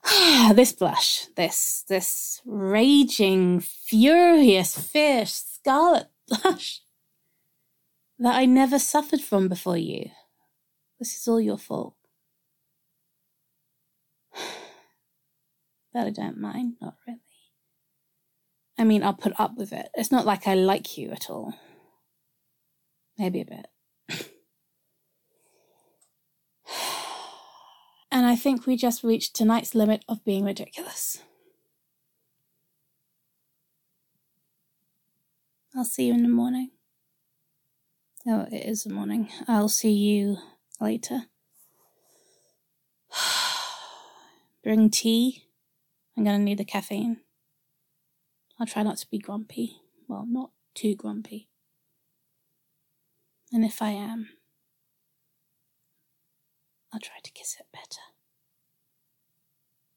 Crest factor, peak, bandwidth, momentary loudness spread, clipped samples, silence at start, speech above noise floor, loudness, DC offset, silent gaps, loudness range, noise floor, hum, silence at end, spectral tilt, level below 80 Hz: 24 dB; -2 dBFS; 17.5 kHz; 20 LU; under 0.1%; 0.05 s; 53 dB; -23 LUFS; under 0.1%; none; 19 LU; -76 dBFS; none; 2 s; -4 dB/octave; -76 dBFS